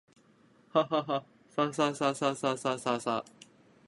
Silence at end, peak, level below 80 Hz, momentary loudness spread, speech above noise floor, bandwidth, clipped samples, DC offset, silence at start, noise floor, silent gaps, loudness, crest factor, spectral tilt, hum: 0.65 s; -12 dBFS; -76 dBFS; 7 LU; 33 dB; 11.5 kHz; under 0.1%; under 0.1%; 0.75 s; -63 dBFS; none; -31 LUFS; 20 dB; -4.5 dB/octave; none